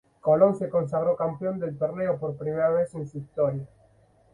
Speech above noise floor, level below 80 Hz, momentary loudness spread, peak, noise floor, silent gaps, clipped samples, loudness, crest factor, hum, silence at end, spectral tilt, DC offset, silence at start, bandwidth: 35 dB; -62 dBFS; 12 LU; -6 dBFS; -60 dBFS; none; under 0.1%; -26 LUFS; 20 dB; none; 0.65 s; -10 dB/octave; under 0.1%; 0.25 s; 10.5 kHz